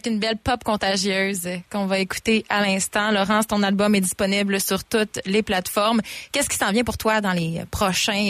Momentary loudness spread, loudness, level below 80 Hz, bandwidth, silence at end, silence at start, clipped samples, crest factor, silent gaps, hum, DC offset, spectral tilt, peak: 4 LU; -21 LUFS; -46 dBFS; 15.5 kHz; 0 s; 0.05 s; under 0.1%; 14 dB; none; none; under 0.1%; -3.5 dB/octave; -8 dBFS